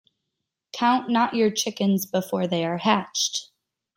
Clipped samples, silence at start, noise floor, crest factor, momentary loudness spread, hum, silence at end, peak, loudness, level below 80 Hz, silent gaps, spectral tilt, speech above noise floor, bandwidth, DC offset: under 0.1%; 0.75 s; -82 dBFS; 18 dB; 5 LU; none; 0.5 s; -8 dBFS; -23 LUFS; -70 dBFS; none; -4 dB/octave; 59 dB; 16.5 kHz; under 0.1%